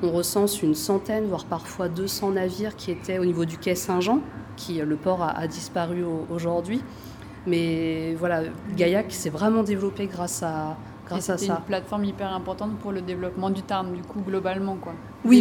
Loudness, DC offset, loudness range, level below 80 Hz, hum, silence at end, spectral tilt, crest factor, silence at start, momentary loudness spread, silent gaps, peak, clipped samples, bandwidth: -26 LUFS; under 0.1%; 3 LU; -54 dBFS; none; 0 s; -5.5 dB/octave; 22 dB; 0 s; 9 LU; none; -4 dBFS; under 0.1%; 19.5 kHz